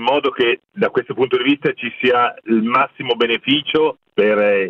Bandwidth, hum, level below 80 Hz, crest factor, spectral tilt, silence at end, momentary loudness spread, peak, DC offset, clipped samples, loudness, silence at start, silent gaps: 6 kHz; none; -60 dBFS; 14 dB; -7 dB/octave; 0 s; 4 LU; -4 dBFS; under 0.1%; under 0.1%; -17 LUFS; 0 s; none